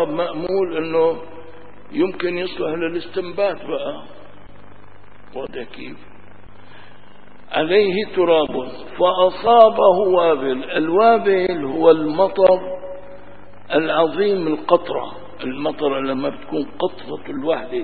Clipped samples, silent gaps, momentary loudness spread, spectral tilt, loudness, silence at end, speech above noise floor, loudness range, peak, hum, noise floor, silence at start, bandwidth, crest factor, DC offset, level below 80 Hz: under 0.1%; none; 17 LU; -9.5 dB/octave; -18 LUFS; 0 s; 29 dB; 13 LU; 0 dBFS; none; -47 dBFS; 0 s; 4.8 kHz; 20 dB; 2%; -54 dBFS